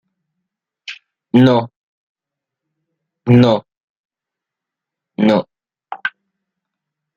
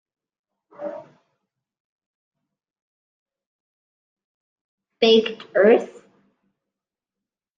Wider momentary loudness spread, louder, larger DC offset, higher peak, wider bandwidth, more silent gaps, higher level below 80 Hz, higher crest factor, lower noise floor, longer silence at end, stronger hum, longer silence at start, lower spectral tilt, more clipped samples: about the same, 22 LU vs 21 LU; first, -15 LUFS vs -18 LUFS; neither; about the same, -2 dBFS vs -4 dBFS; about the same, 7.2 kHz vs 7.4 kHz; second, 1.76-2.15 s, 3.77-4.09 s vs 1.80-1.99 s, 2.06-2.31 s, 2.82-3.26 s, 3.46-4.16 s, 4.24-4.78 s; first, -58 dBFS vs -72 dBFS; about the same, 18 dB vs 22 dB; about the same, -85 dBFS vs -88 dBFS; second, 1.05 s vs 1.7 s; neither; about the same, 0.9 s vs 0.8 s; first, -8.5 dB/octave vs -5 dB/octave; neither